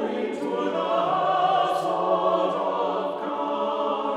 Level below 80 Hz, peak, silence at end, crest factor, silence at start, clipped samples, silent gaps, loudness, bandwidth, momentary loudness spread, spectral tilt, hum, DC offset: -70 dBFS; -10 dBFS; 0 s; 14 dB; 0 s; under 0.1%; none; -24 LUFS; 12.5 kHz; 6 LU; -5.5 dB/octave; none; under 0.1%